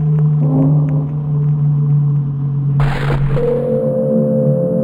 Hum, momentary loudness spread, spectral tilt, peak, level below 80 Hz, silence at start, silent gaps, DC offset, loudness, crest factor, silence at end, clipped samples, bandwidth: none; 4 LU; -10.5 dB/octave; -4 dBFS; -30 dBFS; 0 s; none; under 0.1%; -15 LUFS; 10 dB; 0 s; under 0.1%; 4.5 kHz